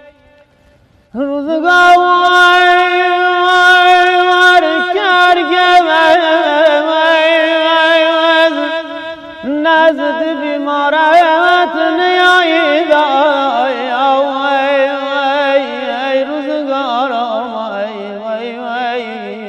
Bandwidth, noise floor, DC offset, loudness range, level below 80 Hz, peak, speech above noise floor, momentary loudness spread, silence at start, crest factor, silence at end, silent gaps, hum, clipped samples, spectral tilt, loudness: 13 kHz; -48 dBFS; under 0.1%; 7 LU; -56 dBFS; 0 dBFS; 40 dB; 13 LU; 1.15 s; 10 dB; 0 s; none; none; under 0.1%; -2.5 dB/octave; -10 LUFS